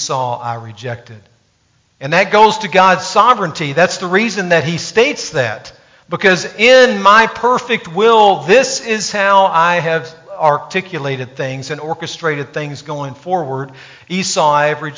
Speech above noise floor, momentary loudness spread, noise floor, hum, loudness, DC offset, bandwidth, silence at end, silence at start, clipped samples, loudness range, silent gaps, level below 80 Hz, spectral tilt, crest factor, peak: 44 dB; 15 LU; -58 dBFS; none; -13 LUFS; under 0.1%; 7.6 kHz; 0 s; 0 s; under 0.1%; 9 LU; none; -56 dBFS; -3.5 dB/octave; 14 dB; 0 dBFS